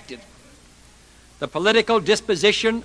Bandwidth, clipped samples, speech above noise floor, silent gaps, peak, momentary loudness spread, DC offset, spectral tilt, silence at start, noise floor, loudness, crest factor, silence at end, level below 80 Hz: 11 kHz; under 0.1%; 30 dB; none; -2 dBFS; 19 LU; under 0.1%; -3 dB/octave; 0.1 s; -50 dBFS; -19 LUFS; 20 dB; 0 s; -52 dBFS